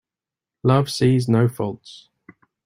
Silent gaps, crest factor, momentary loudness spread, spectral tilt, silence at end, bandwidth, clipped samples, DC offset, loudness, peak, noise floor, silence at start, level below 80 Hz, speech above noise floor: none; 20 dB; 11 LU; -7 dB/octave; 0.7 s; 15.5 kHz; under 0.1%; under 0.1%; -20 LUFS; -2 dBFS; -89 dBFS; 0.65 s; -56 dBFS; 70 dB